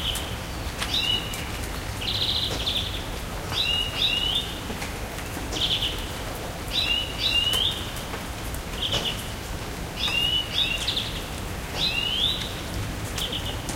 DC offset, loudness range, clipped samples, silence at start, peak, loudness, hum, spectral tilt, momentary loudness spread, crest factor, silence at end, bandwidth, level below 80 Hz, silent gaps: under 0.1%; 1 LU; under 0.1%; 0 s; -10 dBFS; -25 LUFS; none; -2.5 dB/octave; 11 LU; 18 dB; 0 s; 17 kHz; -38 dBFS; none